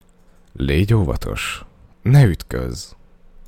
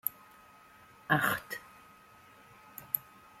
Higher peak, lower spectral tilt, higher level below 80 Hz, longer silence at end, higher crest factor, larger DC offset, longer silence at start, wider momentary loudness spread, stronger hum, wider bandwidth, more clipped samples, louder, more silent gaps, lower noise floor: first, 0 dBFS vs -10 dBFS; first, -6.5 dB/octave vs -4 dB/octave; first, -32 dBFS vs -70 dBFS; first, 0.6 s vs 0.4 s; second, 18 dB vs 28 dB; neither; first, 0.55 s vs 0.05 s; second, 17 LU vs 27 LU; neither; about the same, 16 kHz vs 16.5 kHz; neither; first, -19 LUFS vs -33 LUFS; neither; second, -50 dBFS vs -58 dBFS